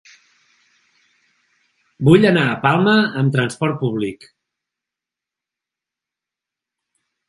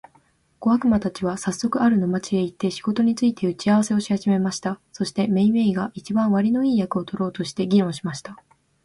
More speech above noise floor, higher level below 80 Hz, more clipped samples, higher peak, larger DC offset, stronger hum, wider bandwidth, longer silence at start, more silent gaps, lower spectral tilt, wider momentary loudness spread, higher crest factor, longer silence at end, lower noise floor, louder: first, 71 dB vs 39 dB; about the same, -56 dBFS vs -56 dBFS; neither; first, 0 dBFS vs -8 dBFS; neither; neither; about the same, 11.5 kHz vs 11.5 kHz; first, 2 s vs 0.6 s; neither; about the same, -7 dB/octave vs -6 dB/octave; about the same, 10 LU vs 8 LU; first, 20 dB vs 14 dB; first, 3.15 s vs 0.5 s; first, -87 dBFS vs -60 dBFS; first, -16 LUFS vs -22 LUFS